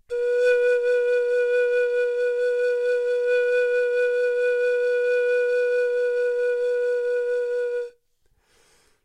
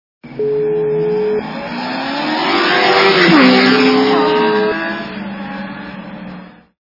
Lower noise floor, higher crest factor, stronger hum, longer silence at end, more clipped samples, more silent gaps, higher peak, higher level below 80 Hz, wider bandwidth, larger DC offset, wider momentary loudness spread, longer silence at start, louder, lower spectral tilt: first, -65 dBFS vs -34 dBFS; about the same, 12 dB vs 14 dB; neither; first, 1.15 s vs 0.45 s; neither; neither; second, -10 dBFS vs 0 dBFS; second, -68 dBFS vs -54 dBFS; first, 9.4 kHz vs 6 kHz; neither; second, 4 LU vs 20 LU; second, 0.1 s vs 0.25 s; second, -22 LUFS vs -13 LUFS; second, -0.5 dB/octave vs -5.5 dB/octave